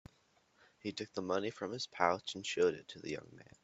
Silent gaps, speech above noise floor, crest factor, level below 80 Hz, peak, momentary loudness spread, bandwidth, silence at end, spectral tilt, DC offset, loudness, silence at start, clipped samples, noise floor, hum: none; 34 dB; 26 dB; -76 dBFS; -14 dBFS; 12 LU; 8.2 kHz; 0.2 s; -4 dB/octave; under 0.1%; -38 LUFS; 0.85 s; under 0.1%; -72 dBFS; none